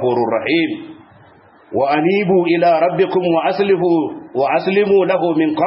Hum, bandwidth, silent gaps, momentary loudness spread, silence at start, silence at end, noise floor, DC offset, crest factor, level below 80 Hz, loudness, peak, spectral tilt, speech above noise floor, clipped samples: none; 5.8 kHz; none; 6 LU; 0 s; 0 s; -46 dBFS; under 0.1%; 12 dB; -62 dBFS; -15 LUFS; -4 dBFS; -11.5 dB/octave; 32 dB; under 0.1%